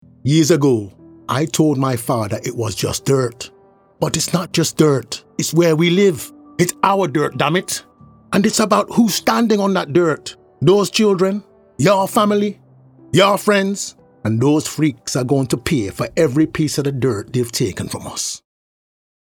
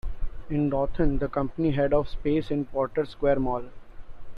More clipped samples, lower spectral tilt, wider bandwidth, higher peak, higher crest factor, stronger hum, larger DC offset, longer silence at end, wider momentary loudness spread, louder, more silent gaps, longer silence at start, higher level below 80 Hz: neither; second, -5 dB/octave vs -9.5 dB/octave; first, over 20 kHz vs 5.2 kHz; first, 0 dBFS vs -10 dBFS; about the same, 18 dB vs 16 dB; neither; neither; first, 0.9 s vs 0 s; first, 11 LU vs 8 LU; first, -17 LUFS vs -27 LUFS; neither; first, 0.25 s vs 0.05 s; second, -52 dBFS vs -36 dBFS